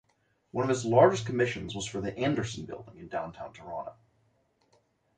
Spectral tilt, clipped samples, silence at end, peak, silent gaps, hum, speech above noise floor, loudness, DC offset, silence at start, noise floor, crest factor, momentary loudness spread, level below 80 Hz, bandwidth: -5.5 dB/octave; under 0.1%; 1.25 s; -8 dBFS; none; none; 43 dB; -29 LUFS; under 0.1%; 0.55 s; -72 dBFS; 22 dB; 19 LU; -60 dBFS; 9.6 kHz